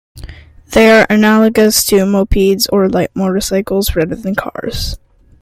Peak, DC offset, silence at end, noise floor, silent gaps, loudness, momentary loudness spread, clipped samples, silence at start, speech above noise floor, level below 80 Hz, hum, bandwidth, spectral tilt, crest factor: 0 dBFS; under 0.1%; 0.45 s; -33 dBFS; none; -12 LUFS; 12 LU; under 0.1%; 0.15 s; 21 dB; -28 dBFS; none; 16 kHz; -4.5 dB/octave; 12 dB